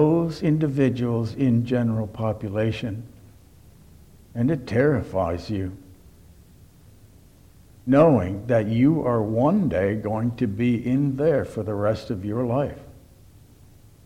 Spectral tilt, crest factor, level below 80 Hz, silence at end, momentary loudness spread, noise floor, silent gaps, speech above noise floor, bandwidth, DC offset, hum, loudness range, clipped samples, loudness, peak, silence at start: -9 dB/octave; 18 dB; -50 dBFS; 1.1 s; 9 LU; -51 dBFS; none; 29 dB; 13.5 kHz; under 0.1%; none; 6 LU; under 0.1%; -23 LUFS; -6 dBFS; 0 s